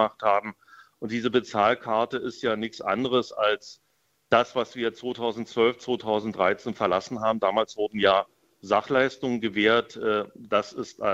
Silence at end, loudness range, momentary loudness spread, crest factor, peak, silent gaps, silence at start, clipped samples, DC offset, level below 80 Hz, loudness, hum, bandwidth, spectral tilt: 0 s; 2 LU; 8 LU; 22 dB; -4 dBFS; none; 0 s; under 0.1%; under 0.1%; -66 dBFS; -26 LUFS; none; 8 kHz; -5 dB/octave